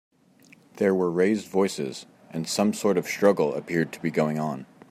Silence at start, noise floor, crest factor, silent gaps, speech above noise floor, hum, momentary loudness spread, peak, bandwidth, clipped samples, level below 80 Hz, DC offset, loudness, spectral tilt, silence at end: 0.75 s; -56 dBFS; 18 dB; none; 32 dB; none; 12 LU; -8 dBFS; 15 kHz; under 0.1%; -70 dBFS; under 0.1%; -25 LUFS; -5.5 dB/octave; 0.25 s